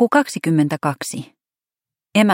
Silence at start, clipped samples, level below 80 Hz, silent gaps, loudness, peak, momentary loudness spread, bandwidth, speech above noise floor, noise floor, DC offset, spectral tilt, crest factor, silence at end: 0 s; under 0.1%; -68 dBFS; none; -19 LUFS; -2 dBFS; 11 LU; 16.5 kHz; over 71 dB; under -90 dBFS; under 0.1%; -5.5 dB/octave; 18 dB; 0 s